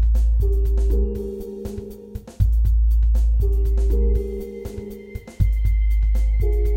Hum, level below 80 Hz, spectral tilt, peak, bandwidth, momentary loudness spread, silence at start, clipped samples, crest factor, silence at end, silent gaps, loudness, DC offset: none; -18 dBFS; -9 dB/octave; -6 dBFS; 2.2 kHz; 15 LU; 0 s; under 0.1%; 12 dB; 0 s; none; -22 LUFS; under 0.1%